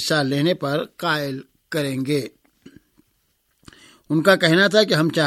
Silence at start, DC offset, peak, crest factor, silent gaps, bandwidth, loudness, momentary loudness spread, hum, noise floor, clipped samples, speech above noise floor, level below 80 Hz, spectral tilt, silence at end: 0 s; under 0.1%; -2 dBFS; 20 dB; none; 16 kHz; -20 LUFS; 13 LU; none; -67 dBFS; under 0.1%; 48 dB; -64 dBFS; -5 dB/octave; 0 s